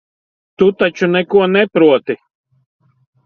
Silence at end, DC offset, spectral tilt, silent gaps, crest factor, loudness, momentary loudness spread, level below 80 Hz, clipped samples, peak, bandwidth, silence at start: 1.1 s; under 0.1%; -7 dB/octave; none; 16 dB; -13 LUFS; 7 LU; -58 dBFS; under 0.1%; 0 dBFS; 6.8 kHz; 0.6 s